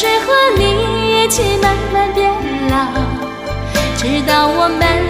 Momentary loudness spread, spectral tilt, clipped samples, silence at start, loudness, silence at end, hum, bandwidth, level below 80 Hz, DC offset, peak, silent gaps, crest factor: 7 LU; -4 dB/octave; under 0.1%; 0 s; -14 LUFS; 0 s; none; 16 kHz; -26 dBFS; under 0.1%; 0 dBFS; none; 14 dB